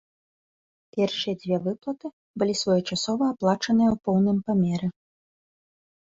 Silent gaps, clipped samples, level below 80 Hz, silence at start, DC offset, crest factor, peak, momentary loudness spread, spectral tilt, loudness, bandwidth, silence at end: 2.13-2.34 s; under 0.1%; -60 dBFS; 0.95 s; under 0.1%; 16 dB; -10 dBFS; 11 LU; -6 dB/octave; -25 LUFS; 8 kHz; 1.1 s